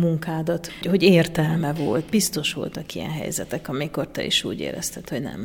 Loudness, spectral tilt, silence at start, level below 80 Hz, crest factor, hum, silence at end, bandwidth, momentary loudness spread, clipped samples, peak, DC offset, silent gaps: -23 LUFS; -4.5 dB/octave; 0 s; -50 dBFS; 20 dB; none; 0 s; 18 kHz; 12 LU; under 0.1%; -2 dBFS; under 0.1%; none